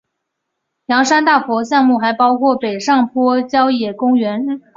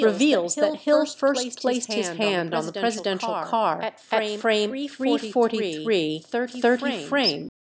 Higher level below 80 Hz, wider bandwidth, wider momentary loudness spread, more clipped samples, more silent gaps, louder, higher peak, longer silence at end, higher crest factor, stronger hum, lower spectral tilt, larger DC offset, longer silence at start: first, -62 dBFS vs -76 dBFS; about the same, 7.6 kHz vs 8 kHz; about the same, 5 LU vs 6 LU; neither; neither; first, -14 LUFS vs -24 LUFS; first, -2 dBFS vs -6 dBFS; about the same, 0.2 s vs 0.3 s; about the same, 14 dB vs 16 dB; neither; about the same, -4 dB/octave vs -3.5 dB/octave; neither; first, 0.9 s vs 0 s